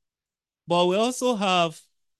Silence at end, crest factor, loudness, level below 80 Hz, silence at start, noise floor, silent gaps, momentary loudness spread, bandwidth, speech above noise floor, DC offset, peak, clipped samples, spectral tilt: 0.4 s; 16 dB; -23 LUFS; -74 dBFS; 0.7 s; under -90 dBFS; none; 4 LU; 12.5 kHz; over 67 dB; under 0.1%; -8 dBFS; under 0.1%; -4 dB/octave